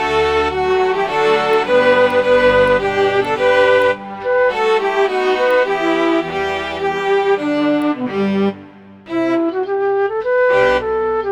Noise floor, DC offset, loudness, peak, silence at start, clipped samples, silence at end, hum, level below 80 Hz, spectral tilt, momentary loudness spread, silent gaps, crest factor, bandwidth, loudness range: -38 dBFS; 0.1%; -15 LUFS; -2 dBFS; 0 s; under 0.1%; 0 s; none; -44 dBFS; -5.5 dB/octave; 7 LU; none; 14 dB; 11 kHz; 4 LU